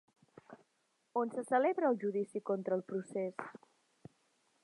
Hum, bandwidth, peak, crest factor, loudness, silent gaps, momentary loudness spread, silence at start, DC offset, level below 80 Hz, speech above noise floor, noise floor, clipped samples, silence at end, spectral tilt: none; 11 kHz; -18 dBFS; 20 dB; -36 LUFS; none; 9 LU; 0.5 s; under 0.1%; -90 dBFS; 43 dB; -79 dBFS; under 0.1%; 1.05 s; -7 dB/octave